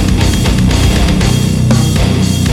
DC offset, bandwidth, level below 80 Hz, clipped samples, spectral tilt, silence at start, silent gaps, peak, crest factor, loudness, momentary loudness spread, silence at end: under 0.1%; 16.5 kHz; -16 dBFS; under 0.1%; -5.5 dB/octave; 0 s; none; 0 dBFS; 10 dB; -11 LUFS; 1 LU; 0 s